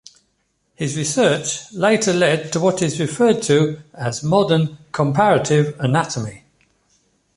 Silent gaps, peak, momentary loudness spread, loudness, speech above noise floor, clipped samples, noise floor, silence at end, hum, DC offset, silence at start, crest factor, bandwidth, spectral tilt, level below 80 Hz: none; -2 dBFS; 9 LU; -18 LUFS; 50 dB; under 0.1%; -67 dBFS; 1 s; none; under 0.1%; 0.8 s; 16 dB; 11.5 kHz; -5 dB/octave; -56 dBFS